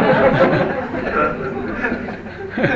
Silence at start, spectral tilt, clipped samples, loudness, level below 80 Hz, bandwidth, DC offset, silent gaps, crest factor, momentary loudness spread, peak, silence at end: 0 s; -8 dB/octave; under 0.1%; -18 LUFS; -40 dBFS; 7.8 kHz; under 0.1%; none; 18 dB; 13 LU; 0 dBFS; 0 s